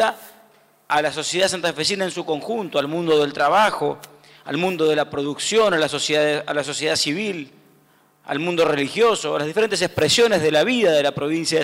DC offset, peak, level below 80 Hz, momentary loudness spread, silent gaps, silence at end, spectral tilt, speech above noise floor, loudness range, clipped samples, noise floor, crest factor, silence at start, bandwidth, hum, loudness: under 0.1%; -10 dBFS; -60 dBFS; 9 LU; none; 0 s; -3.5 dB/octave; 37 dB; 3 LU; under 0.1%; -57 dBFS; 12 dB; 0 s; 16 kHz; none; -20 LUFS